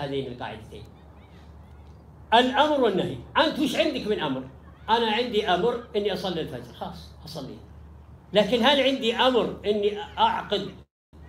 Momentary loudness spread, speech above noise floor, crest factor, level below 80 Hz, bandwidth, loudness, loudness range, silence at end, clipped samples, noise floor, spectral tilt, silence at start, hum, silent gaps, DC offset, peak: 19 LU; 23 dB; 20 dB; -52 dBFS; 16 kHz; -24 LUFS; 4 LU; 0 s; under 0.1%; -48 dBFS; -5 dB/octave; 0 s; none; 10.91-11.13 s; under 0.1%; -4 dBFS